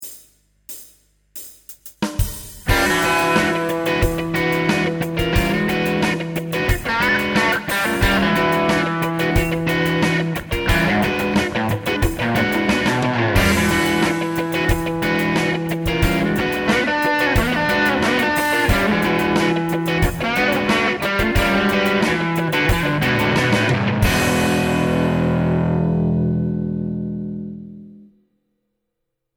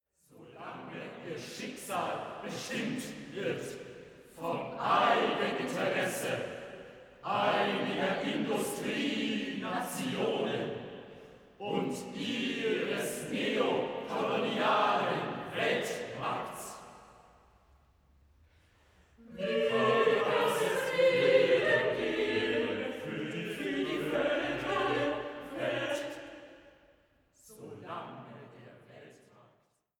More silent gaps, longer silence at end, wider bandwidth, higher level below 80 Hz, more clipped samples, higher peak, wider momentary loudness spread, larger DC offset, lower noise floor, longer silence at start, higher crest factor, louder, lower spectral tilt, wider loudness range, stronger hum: neither; first, 1.35 s vs 0.85 s; about the same, over 20 kHz vs 19.5 kHz; first, -32 dBFS vs -68 dBFS; neither; first, -2 dBFS vs -14 dBFS; second, 7 LU vs 19 LU; neither; first, -77 dBFS vs -71 dBFS; second, 0 s vs 0.35 s; about the same, 16 dB vs 20 dB; first, -18 LUFS vs -32 LUFS; about the same, -5 dB/octave vs -4 dB/octave; second, 3 LU vs 12 LU; first, 50 Hz at -45 dBFS vs none